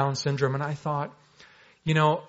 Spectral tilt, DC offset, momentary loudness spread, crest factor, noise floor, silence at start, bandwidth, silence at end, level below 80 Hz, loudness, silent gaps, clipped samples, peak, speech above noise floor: -5 dB/octave; under 0.1%; 11 LU; 20 dB; -55 dBFS; 0 s; 8 kHz; 0.05 s; -64 dBFS; -27 LUFS; none; under 0.1%; -8 dBFS; 29 dB